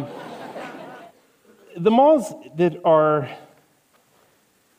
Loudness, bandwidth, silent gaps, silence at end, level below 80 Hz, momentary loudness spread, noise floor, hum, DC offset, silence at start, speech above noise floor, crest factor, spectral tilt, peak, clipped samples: -18 LUFS; 15.5 kHz; none; 1.4 s; -70 dBFS; 24 LU; -61 dBFS; none; under 0.1%; 0 s; 43 dB; 18 dB; -7 dB/octave; -4 dBFS; under 0.1%